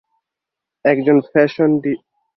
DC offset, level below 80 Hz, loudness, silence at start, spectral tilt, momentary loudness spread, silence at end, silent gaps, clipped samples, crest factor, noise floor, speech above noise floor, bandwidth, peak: under 0.1%; -60 dBFS; -16 LUFS; 0.85 s; -9 dB/octave; 9 LU; 0.4 s; none; under 0.1%; 16 dB; -84 dBFS; 69 dB; 6 kHz; -2 dBFS